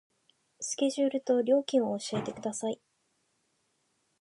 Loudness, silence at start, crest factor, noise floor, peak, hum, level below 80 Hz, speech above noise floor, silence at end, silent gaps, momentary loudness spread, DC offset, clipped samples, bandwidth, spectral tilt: -30 LUFS; 0.6 s; 18 dB; -75 dBFS; -14 dBFS; none; -76 dBFS; 46 dB; 1.45 s; none; 10 LU; under 0.1%; under 0.1%; 11.5 kHz; -4.5 dB/octave